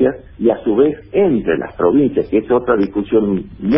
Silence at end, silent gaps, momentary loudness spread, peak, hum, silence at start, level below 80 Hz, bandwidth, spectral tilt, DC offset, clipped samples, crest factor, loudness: 0 s; none; 4 LU; -2 dBFS; none; 0 s; -42 dBFS; 5.6 kHz; -12.5 dB/octave; under 0.1%; under 0.1%; 14 dB; -16 LUFS